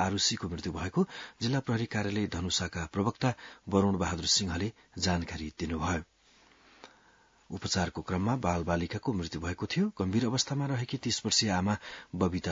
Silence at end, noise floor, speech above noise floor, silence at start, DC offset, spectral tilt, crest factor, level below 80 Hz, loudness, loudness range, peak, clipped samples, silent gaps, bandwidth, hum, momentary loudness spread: 0 s; -63 dBFS; 32 dB; 0 s; under 0.1%; -4.5 dB/octave; 20 dB; -56 dBFS; -31 LUFS; 5 LU; -10 dBFS; under 0.1%; none; 7.8 kHz; none; 9 LU